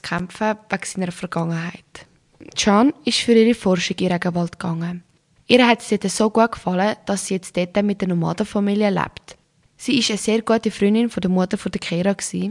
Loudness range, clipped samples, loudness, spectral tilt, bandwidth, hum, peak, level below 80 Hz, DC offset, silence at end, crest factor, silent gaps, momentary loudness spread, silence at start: 3 LU; under 0.1%; -20 LUFS; -5 dB/octave; 11.5 kHz; none; 0 dBFS; -54 dBFS; under 0.1%; 0 s; 20 dB; none; 11 LU; 0.05 s